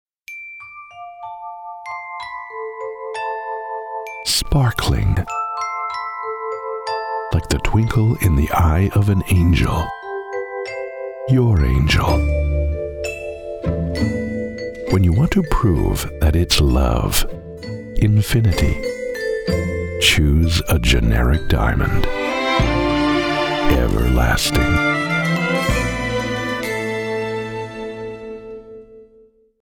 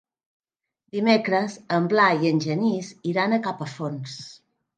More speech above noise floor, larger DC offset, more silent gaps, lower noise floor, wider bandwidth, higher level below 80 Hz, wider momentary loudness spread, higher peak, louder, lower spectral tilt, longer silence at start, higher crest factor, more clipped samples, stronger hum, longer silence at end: second, 36 dB vs 52 dB; neither; neither; second, -51 dBFS vs -75 dBFS; first, 18.5 kHz vs 9.2 kHz; first, -24 dBFS vs -74 dBFS; about the same, 14 LU vs 15 LU; first, 0 dBFS vs -4 dBFS; first, -19 LUFS vs -23 LUFS; about the same, -5.5 dB/octave vs -6 dB/octave; second, 0.3 s vs 0.95 s; about the same, 18 dB vs 20 dB; neither; neither; first, 0.6 s vs 0.4 s